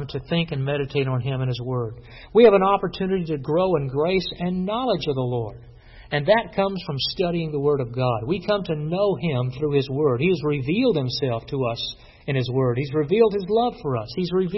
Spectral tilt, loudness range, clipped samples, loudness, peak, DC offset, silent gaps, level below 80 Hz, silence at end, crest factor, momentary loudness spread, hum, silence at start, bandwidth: -8.5 dB/octave; 3 LU; under 0.1%; -23 LUFS; -2 dBFS; under 0.1%; none; -48 dBFS; 0 s; 20 dB; 7 LU; none; 0 s; 6 kHz